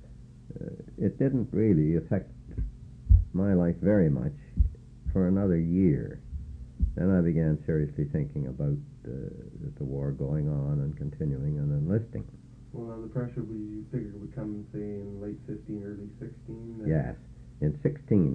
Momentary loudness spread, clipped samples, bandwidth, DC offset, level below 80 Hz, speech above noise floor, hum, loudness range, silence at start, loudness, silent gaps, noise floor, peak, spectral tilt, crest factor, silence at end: 16 LU; under 0.1%; 2.8 kHz; under 0.1%; -38 dBFS; 20 dB; none; 10 LU; 0 s; -29 LUFS; none; -48 dBFS; -8 dBFS; -11.5 dB/octave; 22 dB; 0 s